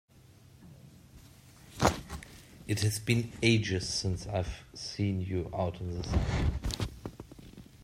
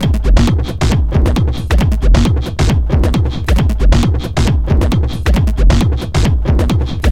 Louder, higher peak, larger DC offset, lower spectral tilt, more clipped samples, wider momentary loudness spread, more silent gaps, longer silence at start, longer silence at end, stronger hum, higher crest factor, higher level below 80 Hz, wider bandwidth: second, -32 LUFS vs -14 LUFS; second, -8 dBFS vs 0 dBFS; second, under 0.1% vs 0.8%; second, -5 dB/octave vs -6.5 dB/octave; neither; first, 21 LU vs 3 LU; neither; first, 0.3 s vs 0 s; about the same, 0.05 s vs 0 s; neither; first, 24 dB vs 12 dB; second, -44 dBFS vs -14 dBFS; about the same, 16 kHz vs 15 kHz